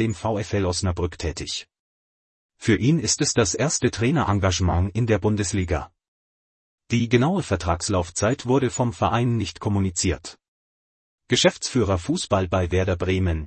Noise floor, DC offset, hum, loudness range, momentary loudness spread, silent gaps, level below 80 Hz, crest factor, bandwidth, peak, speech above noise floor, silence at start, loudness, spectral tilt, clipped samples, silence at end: under -90 dBFS; under 0.1%; none; 3 LU; 8 LU; 1.79-2.49 s, 6.08-6.78 s, 10.48-11.18 s; -44 dBFS; 18 dB; 8.8 kHz; -4 dBFS; over 68 dB; 0 s; -23 LUFS; -5 dB/octave; under 0.1%; 0 s